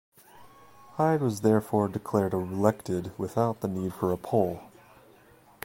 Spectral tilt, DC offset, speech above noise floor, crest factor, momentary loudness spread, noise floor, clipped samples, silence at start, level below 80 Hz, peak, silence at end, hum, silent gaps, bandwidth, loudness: -7.5 dB/octave; under 0.1%; 30 dB; 22 dB; 7 LU; -57 dBFS; under 0.1%; 0.35 s; -60 dBFS; -6 dBFS; 0.95 s; none; none; 16.5 kHz; -28 LUFS